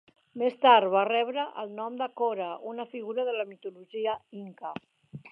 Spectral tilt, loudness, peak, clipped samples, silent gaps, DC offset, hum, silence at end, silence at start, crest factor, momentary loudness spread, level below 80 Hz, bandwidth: -7 dB/octave; -28 LUFS; -6 dBFS; under 0.1%; none; under 0.1%; none; 0.05 s; 0.35 s; 22 dB; 20 LU; -80 dBFS; 5.2 kHz